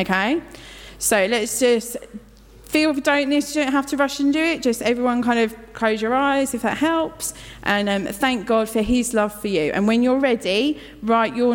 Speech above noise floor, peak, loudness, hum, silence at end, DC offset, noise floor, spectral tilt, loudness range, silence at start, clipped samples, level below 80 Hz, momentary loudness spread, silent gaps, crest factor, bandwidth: 25 dB; -6 dBFS; -20 LUFS; none; 0 s; under 0.1%; -45 dBFS; -3.5 dB/octave; 1 LU; 0 s; under 0.1%; -46 dBFS; 8 LU; none; 14 dB; 17.5 kHz